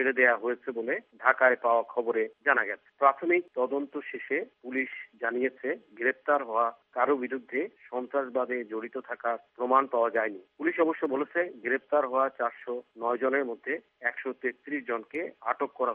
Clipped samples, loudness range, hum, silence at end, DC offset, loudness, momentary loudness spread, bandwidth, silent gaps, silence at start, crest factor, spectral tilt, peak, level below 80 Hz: under 0.1%; 5 LU; none; 0 s; under 0.1%; -29 LUFS; 10 LU; 3.9 kHz; none; 0 s; 24 dB; -2.5 dB/octave; -6 dBFS; -84 dBFS